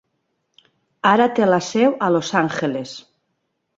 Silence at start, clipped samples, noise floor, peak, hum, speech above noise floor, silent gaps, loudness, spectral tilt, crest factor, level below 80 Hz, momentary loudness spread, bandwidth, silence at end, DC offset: 1.05 s; under 0.1%; -73 dBFS; -2 dBFS; none; 55 dB; none; -18 LUFS; -5 dB/octave; 18 dB; -64 dBFS; 13 LU; 7.8 kHz; 0.8 s; under 0.1%